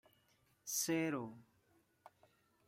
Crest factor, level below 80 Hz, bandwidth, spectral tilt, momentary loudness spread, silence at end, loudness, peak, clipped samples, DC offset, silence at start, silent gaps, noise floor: 20 dB; -84 dBFS; 16 kHz; -3.5 dB/octave; 16 LU; 0.6 s; -39 LUFS; -26 dBFS; under 0.1%; under 0.1%; 0.65 s; none; -75 dBFS